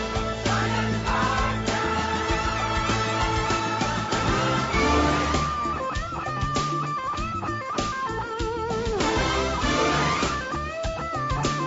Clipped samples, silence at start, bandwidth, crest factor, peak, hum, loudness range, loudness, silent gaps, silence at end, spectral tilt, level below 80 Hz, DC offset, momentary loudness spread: under 0.1%; 0 s; 8 kHz; 14 dB; -10 dBFS; none; 4 LU; -25 LUFS; none; 0 s; -4.5 dB/octave; -36 dBFS; under 0.1%; 7 LU